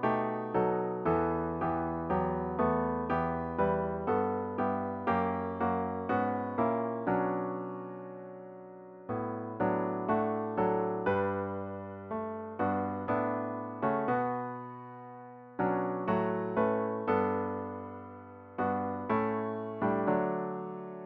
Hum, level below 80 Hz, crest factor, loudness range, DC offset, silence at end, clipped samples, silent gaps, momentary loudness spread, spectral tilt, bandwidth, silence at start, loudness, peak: none; -58 dBFS; 18 dB; 3 LU; under 0.1%; 0 s; under 0.1%; none; 13 LU; -7 dB/octave; 5.2 kHz; 0 s; -32 LUFS; -16 dBFS